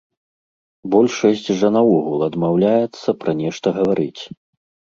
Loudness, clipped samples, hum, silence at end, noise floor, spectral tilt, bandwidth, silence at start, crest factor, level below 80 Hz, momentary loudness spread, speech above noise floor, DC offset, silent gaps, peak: -18 LUFS; under 0.1%; none; 0.65 s; under -90 dBFS; -6.5 dB/octave; 7.6 kHz; 0.85 s; 16 dB; -58 dBFS; 8 LU; over 73 dB; under 0.1%; none; -2 dBFS